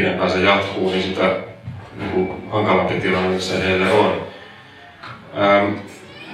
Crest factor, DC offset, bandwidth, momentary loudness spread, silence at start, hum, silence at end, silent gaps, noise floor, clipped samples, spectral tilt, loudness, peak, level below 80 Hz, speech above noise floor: 20 dB; under 0.1%; 12.5 kHz; 20 LU; 0 s; none; 0 s; none; -42 dBFS; under 0.1%; -5.5 dB/octave; -18 LUFS; 0 dBFS; -52 dBFS; 24 dB